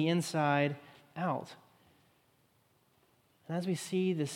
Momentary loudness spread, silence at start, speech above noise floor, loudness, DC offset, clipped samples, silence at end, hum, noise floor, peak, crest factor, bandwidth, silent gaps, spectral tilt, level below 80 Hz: 16 LU; 0 s; 38 dB; -34 LUFS; under 0.1%; under 0.1%; 0 s; none; -71 dBFS; -16 dBFS; 20 dB; 16 kHz; none; -5.5 dB/octave; -82 dBFS